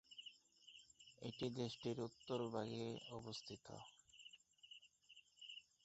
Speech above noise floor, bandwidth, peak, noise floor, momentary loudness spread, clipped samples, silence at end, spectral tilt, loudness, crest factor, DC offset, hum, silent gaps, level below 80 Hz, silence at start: 22 dB; 8 kHz; -30 dBFS; -70 dBFS; 18 LU; under 0.1%; 0.2 s; -5 dB/octave; -50 LUFS; 22 dB; under 0.1%; none; none; -82 dBFS; 0.1 s